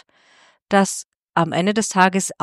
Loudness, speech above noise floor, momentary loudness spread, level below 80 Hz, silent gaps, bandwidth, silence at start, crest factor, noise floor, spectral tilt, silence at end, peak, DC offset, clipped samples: -19 LUFS; 37 dB; 7 LU; -62 dBFS; 1.16-1.23 s; 13.5 kHz; 0.7 s; 20 dB; -55 dBFS; -4 dB/octave; 0.1 s; 0 dBFS; under 0.1%; under 0.1%